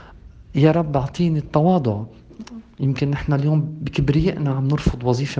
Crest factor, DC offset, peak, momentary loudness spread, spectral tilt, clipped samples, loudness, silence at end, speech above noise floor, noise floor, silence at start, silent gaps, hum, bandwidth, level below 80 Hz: 18 dB; under 0.1%; -2 dBFS; 14 LU; -8 dB/octave; under 0.1%; -20 LUFS; 0 s; 24 dB; -43 dBFS; 0 s; none; none; 7.6 kHz; -38 dBFS